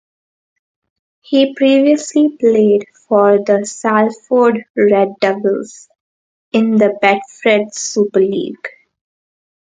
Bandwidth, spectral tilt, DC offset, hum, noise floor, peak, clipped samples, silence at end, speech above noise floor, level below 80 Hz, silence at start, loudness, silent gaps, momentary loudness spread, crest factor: 9.4 kHz; -5 dB/octave; under 0.1%; none; under -90 dBFS; 0 dBFS; under 0.1%; 0.95 s; over 77 dB; -64 dBFS; 1.3 s; -14 LUFS; 4.70-4.75 s, 6.00-6.52 s; 8 LU; 14 dB